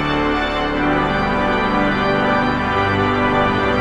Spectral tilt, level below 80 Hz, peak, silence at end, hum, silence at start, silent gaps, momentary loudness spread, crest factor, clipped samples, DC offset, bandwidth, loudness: -6.5 dB/octave; -32 dBFS; -4 dBFS; 0 s; none; 0 s; none; 2 LU; 12 dB; under 0.1%; under 0.1%; 10 kHz; -17 LUFS